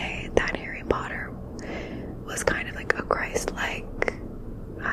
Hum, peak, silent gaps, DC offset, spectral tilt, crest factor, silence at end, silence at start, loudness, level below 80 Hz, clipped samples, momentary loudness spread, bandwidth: none; -2 dBFS; none; under 0.1%; -4 dB/octave; 28 dB; 0 s; 0 s; -29 LUFS; -40 dBFS; under 0.1%; 11 LU; 15.5 kHz